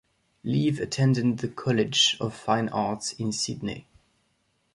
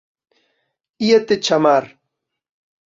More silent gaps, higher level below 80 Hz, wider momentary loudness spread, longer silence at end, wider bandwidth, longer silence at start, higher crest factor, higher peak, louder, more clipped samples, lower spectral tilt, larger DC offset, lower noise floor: neither; about the same, -60 dBFS vs -64 dBFS; first, 11 LU vs 4 LU; about the same, 0.95 s vs 1 s; first, 11.5 kHz vs 7.6 kHz; second, 0.45 s vs 1 s; about the same, 18 dB vs 18 dB; second, -8 dBFS vs -2 dBFS; second, -26 LUFS vs -16 LUFS; neither; about the same, -4.5 dB/octave vs -4.5 dB/octave; neither; second, -71 dBFS vs -78 dBFS